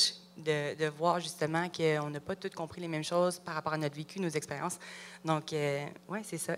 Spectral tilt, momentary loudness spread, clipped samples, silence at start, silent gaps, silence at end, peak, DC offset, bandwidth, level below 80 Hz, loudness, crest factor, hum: -4 dB/octave; 9 LU; under 0.1%; 0 s; none; 0 s; -14 dBFS; under 0.1%; 16 kHz; -74 dBFS; -34 LUFS; 20 dB; none